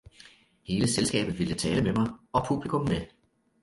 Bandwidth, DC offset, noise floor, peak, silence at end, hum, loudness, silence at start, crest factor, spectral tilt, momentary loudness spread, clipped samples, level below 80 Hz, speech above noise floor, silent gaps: 11.5 kHz; under 0.1%; -56 dBFS; -12 dBFS; 0.55 s; none; -28 LUFS; 0.7 s; 18 dB; -5 dB/octave; 7 LU; under 0.1%; -50 dBFS; 28 dB; none